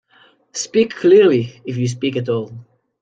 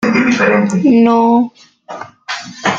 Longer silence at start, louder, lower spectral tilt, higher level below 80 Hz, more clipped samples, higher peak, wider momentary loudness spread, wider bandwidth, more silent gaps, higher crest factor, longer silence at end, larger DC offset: first, 0.55 s vs 0 s; second, -17 LUFS vs -11 LUFS; about the same, -5.5 dB/octave vs -5.5 dB/octave; second, -64 dBFS vs -56 dBFS; neither; about the same, -2 dBFS vs -2 dBFS; second, 15 LU vs 20 LU; first, 9.2 kHz vs 7.8 kHz; neither; about the same, 14 dB vs 12 dB; first, 0.4 s vs 0 s; neither